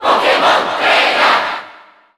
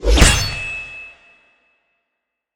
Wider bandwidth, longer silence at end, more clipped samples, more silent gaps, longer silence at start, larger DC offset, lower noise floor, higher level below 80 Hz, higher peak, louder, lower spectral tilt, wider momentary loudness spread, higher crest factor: second, 16.5 kHz vs 19 kHz; second, 0.45 s vs 1.45 s; neither; neither; about the same, 0 s vs 0 s; neither; second, -41 dBFS vs -78 dBFS; second, -56 dBFS vs -22 dBFS; about the same, 0 dBFS vs 0 dBFS; first, -12 LUFS vs -16 LUFS; second, -1.5 dB/octave vs -3 dB/octave; second, 8 LU vs 22 LU; second, 12 dB vs 18 dB